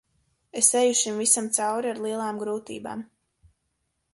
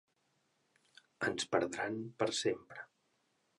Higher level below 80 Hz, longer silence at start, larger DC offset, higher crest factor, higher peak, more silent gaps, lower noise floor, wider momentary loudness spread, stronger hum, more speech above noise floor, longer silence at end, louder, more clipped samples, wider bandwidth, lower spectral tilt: first, -70 dBFS vs -76 dBFS; second, 0.55 s vs 1.2 s; neither; about the same, 24 dB vs 24 dB; first, -4 dBFS vs -16 dBFS; neither; about the same, -76 dBFS vs -79 dBFS; about the same, 16 LU vs 18 LU; neither; first, 51 dB vs 42 dB; first, 1.1 s vs 0.75 s; first, -23 LUFS vs -37 LUFS; neither; about the same, 12 kHz vs 11.5 kHz; second, -1.5 dB/octave vs -3.5 dB/octave